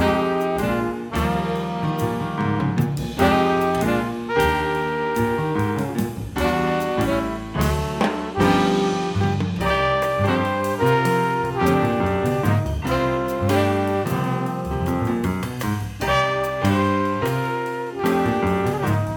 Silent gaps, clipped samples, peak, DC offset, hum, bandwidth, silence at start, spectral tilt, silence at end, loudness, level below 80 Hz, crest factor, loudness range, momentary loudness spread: none; under 0.1%; -4 dBFS; under 0.1%; none; 20 kHz; 0 s; -6.5 dB/octave; 0 s; -21 LUFS; -38 dBFS; 18 dB; 2 LU; 6 LU